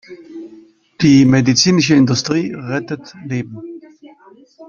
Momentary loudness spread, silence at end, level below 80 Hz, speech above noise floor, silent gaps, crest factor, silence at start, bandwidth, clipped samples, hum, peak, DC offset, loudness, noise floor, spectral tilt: 24 LU; 0.05 s; -50 dBFS; 32 dB; none; 16 dB; 0.1 s; 7.2 kHz; under 0.1%; none; 0 dBFS; under 0.1%; -14 LUFS; -46 dBFS; -5 dB/octave